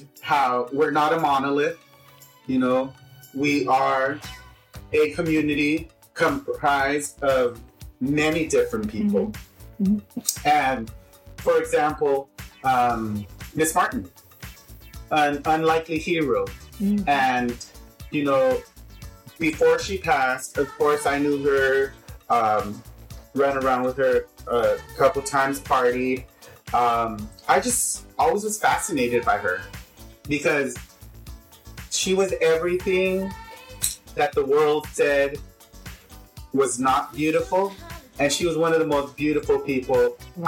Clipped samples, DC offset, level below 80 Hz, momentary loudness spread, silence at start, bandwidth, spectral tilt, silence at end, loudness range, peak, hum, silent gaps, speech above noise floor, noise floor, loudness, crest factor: under 0.1%; under 0.1%; -46 dBFS; 15 LU; 0 s; 17.5 kHz; -4 dB/octave; 0 s; 2 LU; -2 dBFS; none; none; 29 dB; -51 dBFS; -23 LUFS; 20 dB